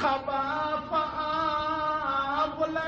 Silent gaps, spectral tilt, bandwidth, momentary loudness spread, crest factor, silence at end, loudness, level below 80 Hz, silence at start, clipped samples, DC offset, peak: none; -5.5 dB/octave; 7.2 kHz; 2 LU; 14 dB; 0 s; -28 LUFS; -54 dBFS; 0 s; under 0.1%; under 0.1%; -14 dBFS